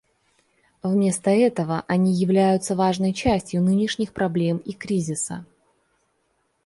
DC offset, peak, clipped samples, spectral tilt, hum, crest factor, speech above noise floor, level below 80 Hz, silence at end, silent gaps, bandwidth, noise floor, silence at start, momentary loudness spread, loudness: under 0.1%; -6 dBFS; under 0.1%; -6 dB/octave; none; 18 dB; 48 dB; -50 dBFS; 1.2 s; none; 11.5 kHz; -70 dBFS; 0.85 s; 8 LU; -22 LUFS